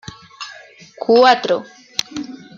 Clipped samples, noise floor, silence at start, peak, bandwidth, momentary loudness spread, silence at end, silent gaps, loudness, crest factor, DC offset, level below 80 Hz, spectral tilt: under 0.1%; -41 dBFS; 0.4 s; 0 dBFS; 13.5 kHz; 22 LU; 0.2 s; none; -16 LUFS; 18 dB; under 0.1%; -60 dBFS; -3 dB/octave